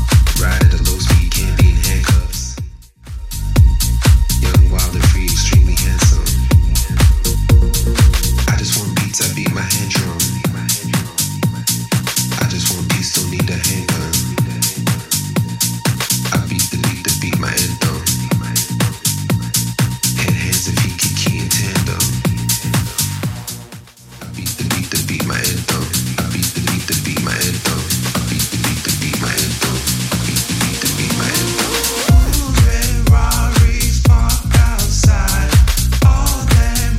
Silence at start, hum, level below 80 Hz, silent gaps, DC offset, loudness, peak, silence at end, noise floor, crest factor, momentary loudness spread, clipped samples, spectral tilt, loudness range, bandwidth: 0 s; none; -18 dBFS; none; under 0.1%; -15 LUFS; 0 dBFS; 0 s; -36 dBFS; 14 dB; 5 LU; under 0.1%; -4 dB/octave; 4 LU; 16.5 kHz